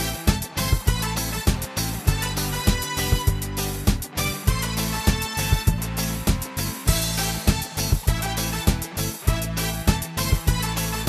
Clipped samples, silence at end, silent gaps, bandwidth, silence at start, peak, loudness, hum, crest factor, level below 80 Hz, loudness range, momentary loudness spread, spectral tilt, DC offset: under 0.1%; 0 s; none; 14.5 kHz; 0 s; -4 dBFS; -24 LUFS; none; 20 dB; -28 dBFS; 1 LU; 3 LU; -4 dB/octave; under 0.1%